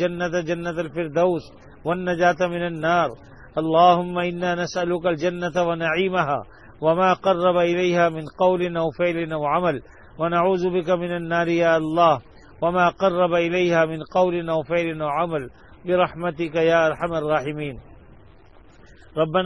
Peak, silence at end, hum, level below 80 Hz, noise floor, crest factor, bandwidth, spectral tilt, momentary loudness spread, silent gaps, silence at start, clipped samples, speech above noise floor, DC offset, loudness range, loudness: -4 dBFS; 0 s; none; -52 dBFS; -50 dBFS; 18 dB; 11 kHz; -6.5 dB/octave; 8 LU; none; 0 s; under 0.1%; 29 dB; 0.2%; 3 LU; -22 LUFS